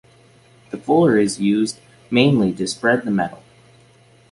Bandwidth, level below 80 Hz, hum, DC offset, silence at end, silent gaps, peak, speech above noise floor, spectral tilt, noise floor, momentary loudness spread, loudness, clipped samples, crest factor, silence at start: 11.5 kHz; -56 dBFS; none; under 0.1%; 0.95 s; none; -2 dBFS; 34 dB; -5.5 dB/octave; -52 dBFS; 13 LU; -18 LUFS; under 0.1%; 16 dB; 0.75 s